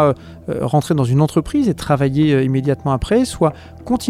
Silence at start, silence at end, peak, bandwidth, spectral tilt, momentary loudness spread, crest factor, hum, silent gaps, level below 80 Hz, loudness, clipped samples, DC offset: 0 s; 0 s; -2 dBFS; 14 kHz; -7 dB/octave; 8 LU; 14 dB; none; none; -38 dBFS; -17 LUFS; under 0.1%; under 0.1%